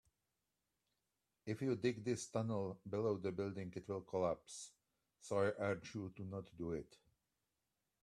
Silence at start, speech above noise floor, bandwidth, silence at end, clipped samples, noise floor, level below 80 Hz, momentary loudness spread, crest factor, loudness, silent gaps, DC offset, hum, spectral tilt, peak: 1.45 s; 47 dB; 13 kHz; 1.05 s; under 0.1%; -89 dBFS; -74 dBFS; 12 LU; 20 dB; -43 LUFS; none; under 0.1%; none; -6 dB/octave; -24 dBFS